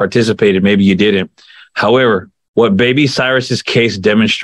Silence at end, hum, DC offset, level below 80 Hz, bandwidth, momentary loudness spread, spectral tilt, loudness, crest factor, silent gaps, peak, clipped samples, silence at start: 0 s; none; under 0.1%; -52 dBFS; 11.5 kHz; 7 LU; -5.5 dB/octave; -12 LUFS; 12 dB; 2.48-2.54 s; 0 dBFS; under 0.1%; 0 s